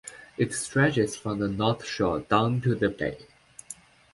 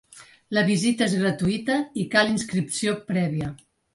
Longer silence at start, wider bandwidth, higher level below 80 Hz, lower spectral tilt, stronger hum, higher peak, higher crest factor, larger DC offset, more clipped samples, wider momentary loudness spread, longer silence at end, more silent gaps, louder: about the same, 0.05 s vs 0.15 s; about the same, 11.5 kHz vs 11.5 kHz; about the same, -54 dBFS vs -56 dBFS; about the same, -5.5 dB/octave vs -5 dB/octave; neither; about the same, -6 dBFS vs -4 dBFS; about the same, 20 dB vs 20 dB; neither; neither; first, 19 LU vs 6 LU; about the same, 0.4 s vs 0.4 s; neither; about the same, -26 LUFS vs -24 LUFS